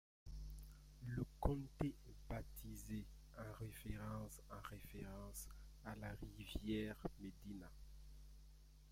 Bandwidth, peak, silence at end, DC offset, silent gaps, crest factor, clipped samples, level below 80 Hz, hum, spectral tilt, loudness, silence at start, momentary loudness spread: 16.5 kHz; -24 dBFS; 0 s; under 0.1%; none; 26 dB; under 0.1%; -56 dBFS; none; -6 dB/octave; -51 LUFS; 0.25 s; 17 LU